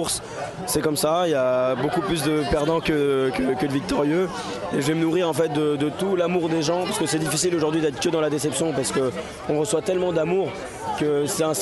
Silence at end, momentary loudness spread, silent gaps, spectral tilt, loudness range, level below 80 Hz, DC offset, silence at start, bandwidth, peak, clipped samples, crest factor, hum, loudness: 0 s; 5 LU; none; -4.5 dB/octave; 2 LU; -48 dBFS; under 0.1%; 0 s; 12.5 kHz; -8 dBFS; under 0.1%; 14 dB; none; -23 LUFS